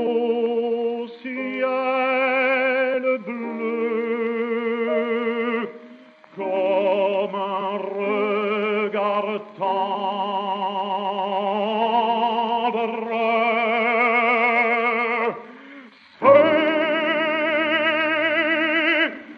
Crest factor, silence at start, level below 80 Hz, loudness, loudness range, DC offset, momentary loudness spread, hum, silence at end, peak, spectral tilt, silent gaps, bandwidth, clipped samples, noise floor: 20 dB; 0 s; -82 dBFS; -21 LUFS; 5 LU; under 0.1%; 8 LU; none; 0 s; -2 dBFS; -6.5 dB/octave; none; 6.2 kHz; under 0.1%; -46 dBFS